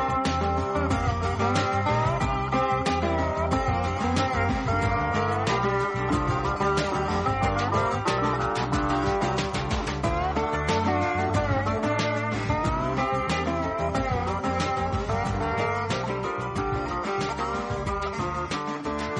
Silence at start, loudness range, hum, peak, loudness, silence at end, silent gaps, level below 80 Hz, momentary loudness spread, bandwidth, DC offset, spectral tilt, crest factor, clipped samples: 0 s; 2 LU; none; -10 dBFS; -26 LUFS; 0 s; none; -38 dBFS; 4 LU; 11 kHz; under 0.1%; -6 dB/octave; 16 dB; under 0.1%